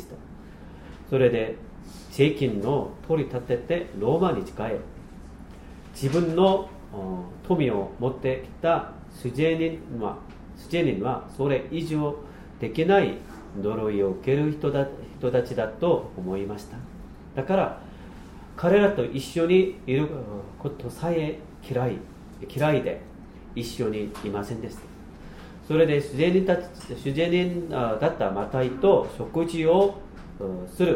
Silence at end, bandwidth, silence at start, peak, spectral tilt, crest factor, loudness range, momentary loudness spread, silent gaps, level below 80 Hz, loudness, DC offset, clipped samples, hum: 0 s; 16 kHz; 0 s; -8 dBFS; -7 dB/octave; 18 dB; 5 LU; 22 LU; none; -46 dBFS; -26 LUFS; under 0.1%; under 0.1%; none